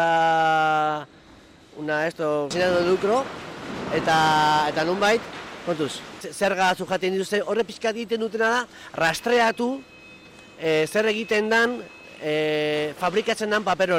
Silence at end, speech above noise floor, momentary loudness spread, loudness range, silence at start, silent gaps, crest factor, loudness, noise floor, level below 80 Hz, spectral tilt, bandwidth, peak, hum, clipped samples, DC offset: 0 s; 27 dB; 14 LU; 3 LU; 0 s; none; 12 dB; -23 LUFS; -50 dBFS; -58 dBFS; -4 dB/octave; 16 kHz; -12 dBFS; none; under 0.1%; under 0.1%